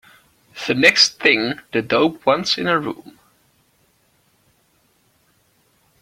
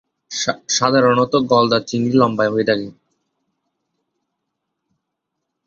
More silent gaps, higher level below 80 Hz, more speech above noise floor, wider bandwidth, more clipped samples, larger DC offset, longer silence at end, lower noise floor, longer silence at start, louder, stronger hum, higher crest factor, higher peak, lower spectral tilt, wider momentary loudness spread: neither; about the same, -60 dBFS vs -58 dBFS; second, 44 dB vs 62 dB; first, 16.5 kHz vs 7.6 kHz; neither; neither; first, 2.9 s vs 2.75 s; second, -61 dBFS vs -78 dBFS; first, 0.55 s vs 0.3 s; about the same, -17 LUFS vs -16 LUFS; neither; about the same, 22 dB vs 18 dB; about the same, 0 dBFS vs -2 dBFS; second, -3 dB/octave vs -4.5 dB/octave; first, 14 LU vs 8 LU